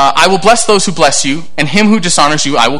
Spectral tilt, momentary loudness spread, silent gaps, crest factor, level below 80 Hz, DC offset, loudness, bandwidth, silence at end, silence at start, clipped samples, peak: -3 dB/octave; 5 LU; none; 10 dB; -40 dBFS; 10%; -9 LUFS; 18 kHz; 0 s; 0 s; 1%; 0 dBFS